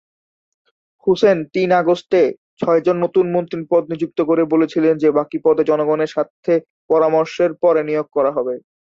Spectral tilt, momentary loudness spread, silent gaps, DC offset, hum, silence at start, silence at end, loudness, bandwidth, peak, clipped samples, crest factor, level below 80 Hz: -7.5 dB/octave; 6 LU; 2.38-2.57 s, 6.30-6.43 s, 6.70-6.89 s; under 0.1%; none; 1.05 s; 0.25 s; -17 LUFS; 7.4 kHz; -2 dBFS; under 0.1%; 14 dB; -62 dBFS